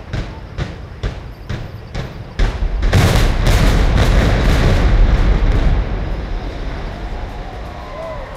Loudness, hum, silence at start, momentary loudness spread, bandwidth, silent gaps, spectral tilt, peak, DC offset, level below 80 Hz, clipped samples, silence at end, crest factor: -18 LUFS; none; 0 s; 14 LU; 14.5 kHz; none; -6 dB/octave; -2 dBFS; under 0.1%; -16 dBFS; under 0.1%; 0 s; 14 dB